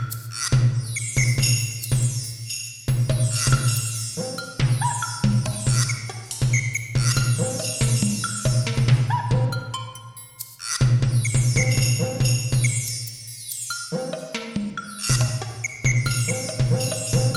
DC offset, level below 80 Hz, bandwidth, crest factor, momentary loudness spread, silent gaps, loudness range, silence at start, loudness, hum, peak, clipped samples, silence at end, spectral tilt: under 0.1%; -40 dBFS; 16 kHz; 16 dB; 10 LU; none; 3 LU; 0 s; -23 LUFS; none; -6 dBFS; under 0.1%; 0 s; -4 dB/octave